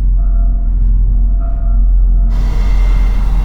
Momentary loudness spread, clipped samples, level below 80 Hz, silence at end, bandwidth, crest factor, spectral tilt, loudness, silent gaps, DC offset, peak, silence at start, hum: 3 LU; under 0.1%; -10 dBFS; 0 s; 3.6 kHz; 8 dB; -8 dB/octave; -15 LUFS; none; under 0.1%; -2 dBFS; 0 s; none